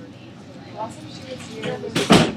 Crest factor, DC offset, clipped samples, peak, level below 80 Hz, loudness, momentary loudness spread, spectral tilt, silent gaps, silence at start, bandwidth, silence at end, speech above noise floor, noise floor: 22 dB; under 0.1%; under 0.1%; 0 dBFS; -46 dBFS; -23 LUFS; 24 LU; -4.5 dB/octave; none; 0 s; 16 kHz; 0 s; 19 dB; -40 dBFS